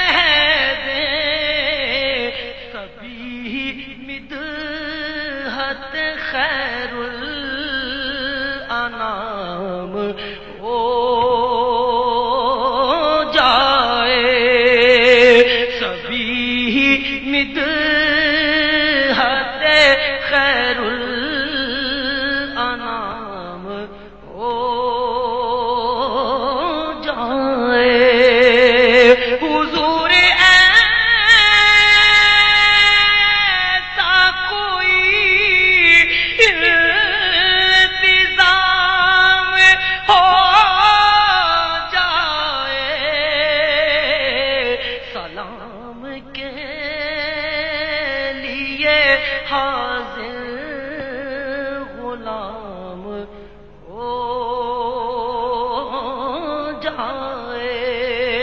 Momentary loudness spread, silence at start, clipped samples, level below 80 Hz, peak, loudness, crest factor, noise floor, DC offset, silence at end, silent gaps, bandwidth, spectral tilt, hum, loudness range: 18 LU; 0 s; under 0.1%; -40 dBFS; 0 dBFS; -14 LUFS; 16 dB; -40 dBFS; 0.5%; 0 s; none; 8.4 kHz; -3 dB/octave; none; 14 LU